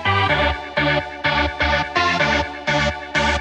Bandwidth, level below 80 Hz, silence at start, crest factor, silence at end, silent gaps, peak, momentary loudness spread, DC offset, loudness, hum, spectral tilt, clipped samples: 9.8 kHz; -32 dBFS; 0 s; 14 dB; 0 s; none; -6 dBFS; 4 LU; under 0.1%; -19 LUFS; none; -4.5 dB/octave; under 0.1%